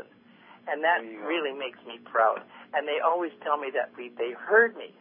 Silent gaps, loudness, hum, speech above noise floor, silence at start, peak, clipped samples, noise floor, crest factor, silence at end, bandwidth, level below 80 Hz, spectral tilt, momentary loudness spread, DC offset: none; -27 LUFS; none; 27 dB; 0 s; -8 dBFS; under 0.1%; -54 dBFS; 20 dB; 0.1 s; 3.7 kHz; under -90 dBFS; -6.5 dB/octave; 14 LU; under 0.1%